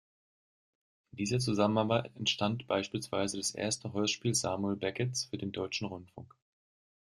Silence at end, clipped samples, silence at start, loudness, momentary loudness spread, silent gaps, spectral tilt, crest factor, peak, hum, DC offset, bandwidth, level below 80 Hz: 0.85 s; under 0.1%; 1.15 s; -33 LUFS; 9 LU; none; -4 dB/octave; 22 dB; -14 dBFS; none; under 0.1%; 13.5 kHz; -68 dBFS